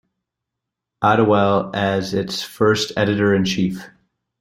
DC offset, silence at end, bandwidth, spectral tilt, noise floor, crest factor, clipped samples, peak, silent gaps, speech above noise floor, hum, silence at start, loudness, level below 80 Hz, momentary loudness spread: under 0.1%; 0.55 s; 16 kHz; -5.5 dB/octave; -82 dBFS; 18 dB; under 0.1%; -2 dBFS; none; 64 dB; none; 1 s; -18 LUFS; -54 dBFS; 8 LU